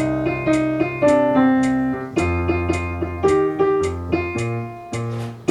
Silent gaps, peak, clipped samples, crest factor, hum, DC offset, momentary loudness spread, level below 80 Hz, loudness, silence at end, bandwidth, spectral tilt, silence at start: none; -4 dBFS; under 0.1%; 16 dB; none; under 0.1%; 10 LU; -40 dBFS; -20 LUFS; 0 s; 11.5 kHz; -7 dB/octave; 0 s